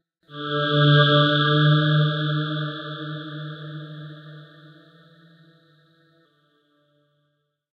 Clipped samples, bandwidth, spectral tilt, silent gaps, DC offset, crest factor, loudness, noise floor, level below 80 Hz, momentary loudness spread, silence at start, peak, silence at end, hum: under 0.1%; 5.2 kHz; -8.5 dB/octave; none; under 0.1%; 20 dB; -20 LUFS; -73 dBFS; -66 dBFS; 23 LU; 0.3 s; -4 dBFS; 3.3 s; none